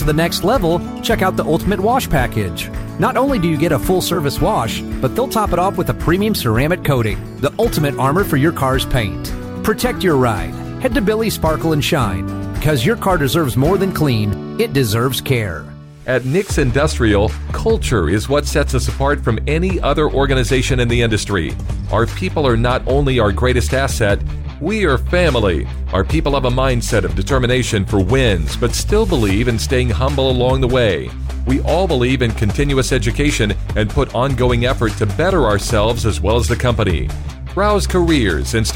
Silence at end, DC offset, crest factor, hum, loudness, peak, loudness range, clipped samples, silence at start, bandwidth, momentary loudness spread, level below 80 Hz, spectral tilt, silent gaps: 0 s; under 0.1%; 10 dB; none; -16 LUFS; -4 dBFS; 1 LU; under 0.1%; 0 s; 16.5 kHz; 6 LU; -24 dBFS; -5.5 dB/octave; none